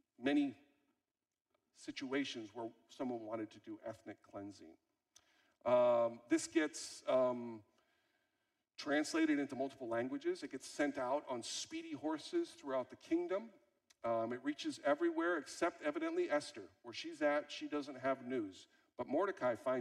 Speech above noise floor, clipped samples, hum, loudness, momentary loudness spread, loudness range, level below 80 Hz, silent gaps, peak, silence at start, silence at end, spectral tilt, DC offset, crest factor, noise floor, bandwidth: over 51 dB; under 0.1%; none; -40 LUFS; 15 LU; 8 LU; -84 dBFS; none; -22 dBFS; 0.2 s; 0 s; -4 dB/octave; under 0.1%; 18 dB; under -90 dBFS; 12.5 kHz